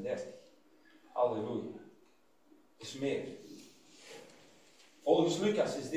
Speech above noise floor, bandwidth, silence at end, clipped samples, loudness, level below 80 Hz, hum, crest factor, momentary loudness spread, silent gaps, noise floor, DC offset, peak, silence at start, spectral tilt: 36 dB; 15.5 kHz; 0 s; under 0.1%; -34 LUFS; -76 dBFS; none; 22 dB; 24 LU; none; -69 dBFS; under 0.1%; -14 dBFS; 0 s; -5 dB/octave